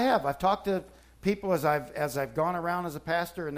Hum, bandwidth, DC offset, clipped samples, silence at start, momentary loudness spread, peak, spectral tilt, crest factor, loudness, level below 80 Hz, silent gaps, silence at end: none; 15.5 kHz; under 0.1%; under 0.1%; 0 s; 6 LU; -12 dBFS; -5.5 dB/octave; 16 dB; -29 LUFS; -56 dBFS; none; 0 s